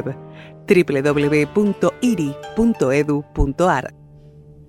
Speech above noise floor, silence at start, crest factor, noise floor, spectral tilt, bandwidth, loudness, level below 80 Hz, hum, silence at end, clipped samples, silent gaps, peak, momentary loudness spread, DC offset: 25 dB; 0 s; 18 dB; -43 dBFS; -6.5 dB/octave; 14.5 kHz; -18 LUFS; -34 dBFS; none; 0.8 s; under 0.1%; none; -2 dBFS; 14 LU; under 0.1%